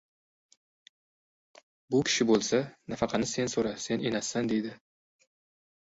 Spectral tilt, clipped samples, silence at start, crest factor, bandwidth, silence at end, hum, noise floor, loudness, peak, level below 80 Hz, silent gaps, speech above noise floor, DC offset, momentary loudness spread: -4 dB/octave; under 0.1%; 1.9 s; 20 dB; 8 kHz; 1.2 s; none; under -90 dBFS; -29 LUFS; -12 dBFS; -64 dBFS; none; over 61 dB; under 0.1%; 8 LU